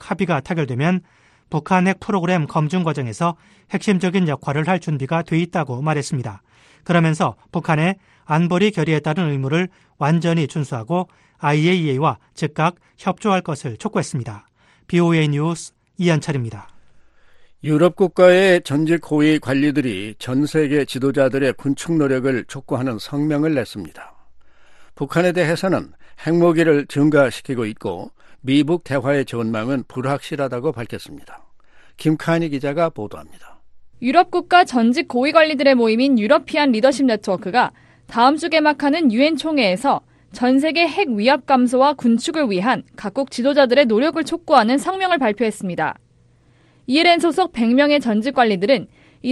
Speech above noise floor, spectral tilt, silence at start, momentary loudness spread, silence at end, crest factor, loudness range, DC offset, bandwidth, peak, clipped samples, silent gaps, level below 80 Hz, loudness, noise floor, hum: 36 dB; -6 dB/octave; 0 s; 11 LU; 0 s; 18 dB; 5 LU; under 0.1%; 12.5 kHz; 0 dBFS; under 0.1%; none; -56 dBFS; -18 LUFS; -54 dBFS; none